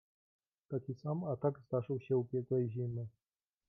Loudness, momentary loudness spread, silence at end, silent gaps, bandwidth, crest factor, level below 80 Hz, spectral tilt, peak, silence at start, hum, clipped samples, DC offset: -38 LUFS; 8 LU; 0.6 s; none; 6 kHz; 16 dB; -78 dBFS; -11 dB/octave; -22 dBFS; 0.7 s; none; under 0.1%; under 0.1%